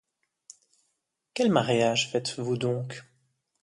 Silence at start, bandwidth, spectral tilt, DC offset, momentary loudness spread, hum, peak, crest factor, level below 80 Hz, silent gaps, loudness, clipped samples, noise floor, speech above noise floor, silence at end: 1.35 s; 11.5 kHz; -4.5 dB/octave; under 0.1%; 16 LU; none; -8 dBFS; 20 dB; -70 dBFS; none; -26 LUFS; under 0.1%; -79 dBFS; 53 dB; 0.6 s